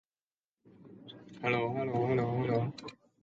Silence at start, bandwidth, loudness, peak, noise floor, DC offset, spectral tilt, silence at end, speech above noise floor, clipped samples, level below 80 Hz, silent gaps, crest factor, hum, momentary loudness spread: 0.8 s; 7.6 kHz; -32 LUFS; -18 dBFS; under -90 dBFS; under 0.1%; -8 dB/octave; 0.3 s; over 58 dB; under 0.1%; -68 dBFS; none; 18 dB; none; 20 LU